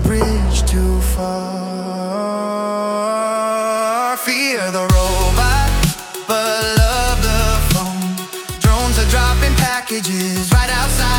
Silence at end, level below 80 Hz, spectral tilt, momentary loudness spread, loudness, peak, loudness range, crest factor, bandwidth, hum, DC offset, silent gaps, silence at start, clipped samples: 0 s; -20 dBFS; -4.5 dB/octave; 7 LU; -17 LUFS; -2 dBFS; 3 LU; 14 dB; 18 kHz; none; under 0.1%; none; 0 s; under 0.1%